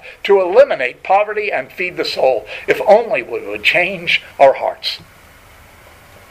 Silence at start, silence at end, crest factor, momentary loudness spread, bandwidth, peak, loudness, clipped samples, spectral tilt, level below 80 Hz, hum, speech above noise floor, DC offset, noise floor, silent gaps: 0.05 s; 1.25 s; 16 dB; 10 LU; 15.5 kHz; 0 dBFS; -15 LUFS; under 0.1%; -4 dB/octave; -52 dBFS; none; 28 dB; under 0.1%; -43 dBFS; none